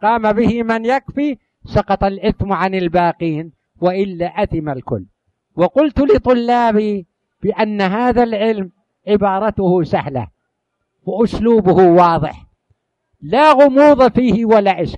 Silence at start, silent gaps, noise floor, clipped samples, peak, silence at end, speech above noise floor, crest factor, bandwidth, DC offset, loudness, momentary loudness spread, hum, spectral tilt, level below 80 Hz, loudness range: 0 s; none; -72 dBFS; under 0.1%; 0 dBFS; 0 s; 59 dB; 14 dB; 9.6 kHz; under 0.1%; -14 LUFS; 15 LU; none; -8 dB/octave; -38 dBFS; 6 LU